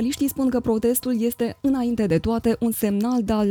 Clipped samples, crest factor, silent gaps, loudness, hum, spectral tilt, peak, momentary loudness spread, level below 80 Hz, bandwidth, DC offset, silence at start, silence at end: under 0.1%; 14 dB; none; -22 LUFS; none; -6 dB/octave; -8 dBFS; 2 LU; -44 dBFS; over 20 kHz; under 0.1%; 0 s; 0 s